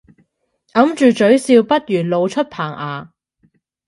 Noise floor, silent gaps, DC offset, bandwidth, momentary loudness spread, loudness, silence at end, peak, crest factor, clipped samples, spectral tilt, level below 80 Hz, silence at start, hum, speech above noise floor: -64 dBFS; none; under 0.1%; 11.5 kHz; 13 LU; -15 LUFS; 0.8 s; 0 dBFS; 16 dB; under 0.1%; -6 dB/octave; -62 dBFS; 0.75 s; none; 50 dB